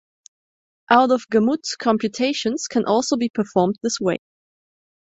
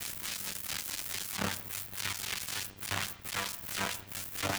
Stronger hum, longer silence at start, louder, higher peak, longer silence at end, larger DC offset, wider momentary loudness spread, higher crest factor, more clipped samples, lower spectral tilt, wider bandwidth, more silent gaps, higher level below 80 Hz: neither; first, 0.9 s vs 0 s; first, -20 LUFS vs -35 LUFS; first, -2 dBFS vs -16 dBFS; first, 1 s vs 0 s; neither; first, 6 LU vs 3 LU; about the same, 20 dB vs 20 dB; neither; first, -4.5 dB/octave vs -1.5 dB/octave; second, 8.2 kHz vs over 20 kHz; first, 3.30-3.34 s vs none; about the same, -64 dBFS vs -62 dBFS